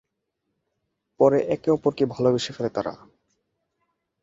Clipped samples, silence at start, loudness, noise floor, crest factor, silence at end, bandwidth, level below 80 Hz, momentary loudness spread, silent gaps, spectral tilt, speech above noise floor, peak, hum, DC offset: under 0.1%; 1.2 s; -23 LUFS; -79 dBFS; 22 dB; 1.25 s; 7.8 kHz; -62 dBFS; 8 LU; none; -6.5 dB/octave; 57 dB; -4 dBFS; none; under 0.1%